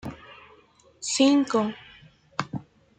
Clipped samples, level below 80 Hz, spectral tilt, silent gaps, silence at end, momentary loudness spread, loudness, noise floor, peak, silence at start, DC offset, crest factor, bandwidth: under 0.1%; -62 dBFS; -4 dB/octave; none; 0.4 s; 21 LU; -25 LUFS; -57 dBFS; -8 dBFS; 0.05 s; under 0.1%; 20 dB; 9.4 kHz